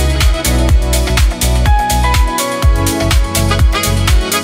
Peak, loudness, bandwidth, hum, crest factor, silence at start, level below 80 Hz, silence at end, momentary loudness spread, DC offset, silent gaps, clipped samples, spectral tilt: 0 dBFS; -13 LUFS; 16.5 kHz; none; 10 dB; 0 s; -14 dBFS; 0 s; 1 LU; under 0.1%; none; under 0.1%; -4 dB/octave